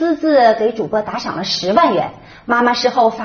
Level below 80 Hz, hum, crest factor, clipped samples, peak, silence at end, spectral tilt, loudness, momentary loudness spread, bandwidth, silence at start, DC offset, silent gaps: -52 dBFS; none; 16 dB; under 0.1%; 0 dBFS; 0 s; -2.5 dB/octave; -15 LUFS; 10 LU; 6.8 kHz; 0 s; under 0.1%; none